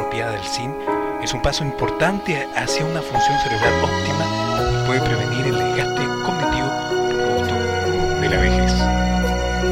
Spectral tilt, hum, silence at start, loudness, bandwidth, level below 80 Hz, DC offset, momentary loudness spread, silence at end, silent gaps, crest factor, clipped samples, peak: -5 dB/octave; none; 0 s; -20 LUFS; 16.5 kHz; -30 dBFS; under 0.1%; 5 LU; 0 s; none; 16 dB; under 0.1%; -4 dBFS